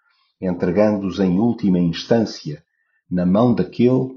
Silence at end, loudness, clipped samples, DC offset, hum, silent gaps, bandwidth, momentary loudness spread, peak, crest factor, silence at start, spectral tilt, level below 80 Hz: 0 s; -19 LUFS; under 0.1%; under 0.1%; none; none; 7 kHz; 11 LU; -2 dBFS; 18 dB; 0.4 s; -7.5 dB/octave; -52 dBFS